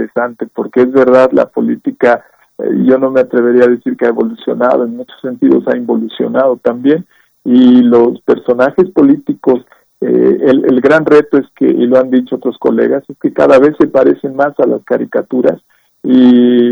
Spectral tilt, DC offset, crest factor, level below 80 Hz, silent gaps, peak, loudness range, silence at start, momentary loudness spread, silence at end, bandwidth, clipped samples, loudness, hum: -8 dB/octave; under 0.1%; 10 dB; -54 dBFS; none; 0 dBFS; 2 LU; 0 s; 10 LU; 0 s; 6.2 kHz; 0.5%; -10 LUFS; none